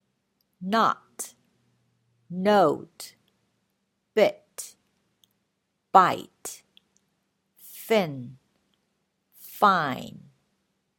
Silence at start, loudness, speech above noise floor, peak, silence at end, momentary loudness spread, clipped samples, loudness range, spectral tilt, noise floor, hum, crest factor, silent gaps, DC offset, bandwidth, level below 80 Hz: 0.6 s; -24 LUFS; 54 dB; -2 dBFS; 0.8 s; 23 LU; under 0.1%; 5 LU; -4.5 dB/octave; -77 dBFS; none; 26 dB; none; under 0.1%; 17.5 kHz; -74 dBFS